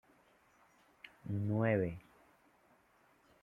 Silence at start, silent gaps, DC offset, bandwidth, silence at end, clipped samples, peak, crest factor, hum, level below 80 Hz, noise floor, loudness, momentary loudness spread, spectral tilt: 1.05 s; none; under 0.1%; 4.2 kHz; 1.45 s; under 0.1%; -18 dBFS; 22 dB; none; -70 dBFS; -70 dBFS; -36 LUFS; 24 LU; -9.5 dB/octave